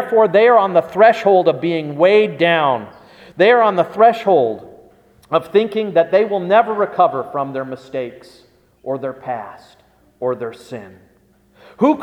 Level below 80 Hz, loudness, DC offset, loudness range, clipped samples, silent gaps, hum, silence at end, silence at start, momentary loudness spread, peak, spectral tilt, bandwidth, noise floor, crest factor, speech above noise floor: -62 dBFS; -15 LUFS; under 0.1%; 13 LU; under 0.1%; none; none; 0 s; 0 s; 15 LU; 0 dBFS; -6.5 dB/octave; 10 kHz; -54 dBFS; 16 dB; 39 dB